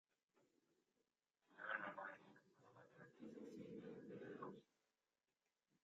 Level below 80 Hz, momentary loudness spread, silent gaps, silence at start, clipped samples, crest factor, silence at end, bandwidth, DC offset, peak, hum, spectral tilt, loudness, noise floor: under -90 dBFS; 17 LU; none; 0.35 s; under 0.1%; 26 dB; 1.2 s; 7.4 kHz; under 0.1%; -32 dBFS; none; -4 dB/octave; -55 LUFS; under -90 dBFS